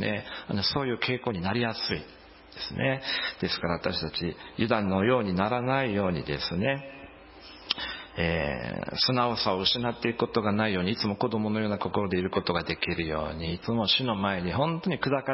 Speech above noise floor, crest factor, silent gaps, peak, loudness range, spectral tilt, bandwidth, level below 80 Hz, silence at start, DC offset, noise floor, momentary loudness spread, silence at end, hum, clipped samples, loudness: 20 dB; 20 dB; none; -10 dBFS; 3 LU; -8.5 dB/octave; 5.8 kHz; -50 dBFS; 0 s; under 0.1%; -48 dBFS; 9 LU; 0 s; none; under 0.1%; -28 LUFS